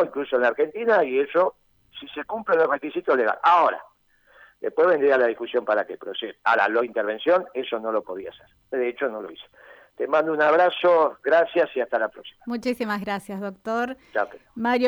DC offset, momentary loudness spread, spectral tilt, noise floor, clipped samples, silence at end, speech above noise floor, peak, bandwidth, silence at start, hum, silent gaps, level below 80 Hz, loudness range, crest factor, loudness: under 0.1%; 14 LU; -5.5 dB/octave; -59 dBFS; under 0.1%; 0 s; 36 dB; -8 dBFS; over 20 kHz; 0 s; none; none; -68 dBFS; 5 LU; 16 dB; -23 LUFS